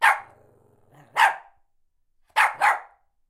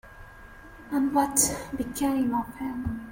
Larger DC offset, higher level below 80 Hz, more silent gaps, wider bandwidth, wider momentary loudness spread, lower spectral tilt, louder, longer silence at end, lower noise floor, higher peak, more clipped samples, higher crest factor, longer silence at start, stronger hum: neither; second, -70 dBFS vs -48 dBFS; neither; about the same, 16 kHz vs 17 kHz; about the same, 10 LU vs 11 LU; second, 1 dB/octave vs -3.5 dB/octave; first, -22 LUFS vs -27 LUFS; first, 0.45 s vs 0 s; first, -66 dBFS vs -47 dBFS; first, -2 dBFS vs -6 dBFS; neither; about the same, 22 dB vs 22 dB; about the same, 0 s vs 0.05 s; neither